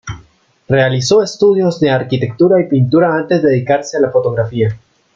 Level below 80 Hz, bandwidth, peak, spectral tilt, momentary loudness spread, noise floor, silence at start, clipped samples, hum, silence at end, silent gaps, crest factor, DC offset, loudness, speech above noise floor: -48 dBFS; 7.6 kHz; -2 dBFS; -6.5 dB/octave; 7 LU; -48 dBFS; 0.05 s; under 0.1%; none; 0.4 s; none; 12 dB; under 0.1%; -13 LUFS; 36 dB